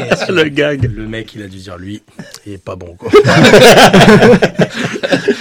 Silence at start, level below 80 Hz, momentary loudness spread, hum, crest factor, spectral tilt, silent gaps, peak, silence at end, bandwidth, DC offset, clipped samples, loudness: 0 s; -34 dBFS; 25 LU; none; 10 dB; -5 dB/octave; none; 0 dBFS; 0 s; over 20 kHz; under 0.1%; 6%; -7 LUFS